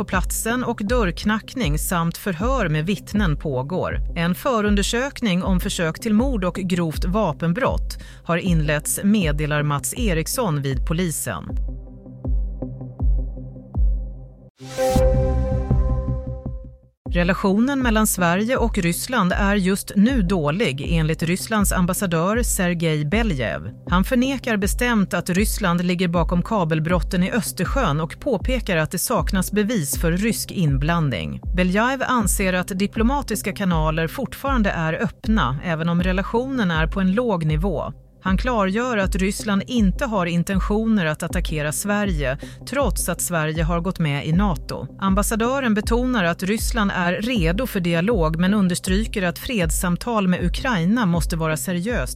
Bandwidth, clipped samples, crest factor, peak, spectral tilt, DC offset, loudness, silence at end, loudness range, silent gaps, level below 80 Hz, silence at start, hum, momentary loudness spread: 16 kHz; under 0.1%; 16 dB; -4 dBFS; -5 dB/octave; under 0.1%; -21 LUFS; 0 s; 3 LU; 14.50-14.55 s, 16.97-17.05 s; -28 dBFS; 0 s; none; 6 LU